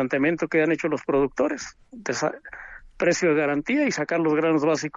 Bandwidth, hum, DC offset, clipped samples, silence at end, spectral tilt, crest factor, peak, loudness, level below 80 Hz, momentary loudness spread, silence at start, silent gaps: 7.8 kHz; none; under 0.1%; under 0.1%; 0 s; -5 dB/octave; 14 dB; -10 dBFS; -23 LUFS; -56 dBFS; 15 LU; 0 s; none